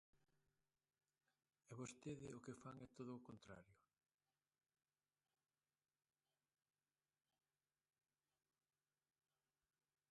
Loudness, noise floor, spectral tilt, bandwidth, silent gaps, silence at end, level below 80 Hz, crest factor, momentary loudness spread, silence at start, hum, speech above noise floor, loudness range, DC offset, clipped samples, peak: -58 LUFS; under -90 dBFS; -5.5 dB/octave; 11 kHz; none; 6.35 s; -88 dBFS; 22 dB; 8 LU; 0.15 s; none; over 32 dB; 5 LU; under 0.1%; under 0.1%; -42 dBFS